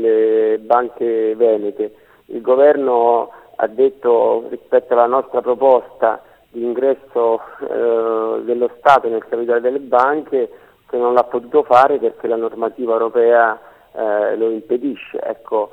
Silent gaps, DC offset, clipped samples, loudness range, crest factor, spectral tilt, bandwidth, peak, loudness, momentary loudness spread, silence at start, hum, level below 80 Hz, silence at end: none; under 0.1%; under 0.1%; 2 LU; 16 dB; -6.5 dB/octave; 5.2 kHz; 0 dBFS; -16 LUFS; 12 LU; 0 s; none; -64 dBFS; 0.05 s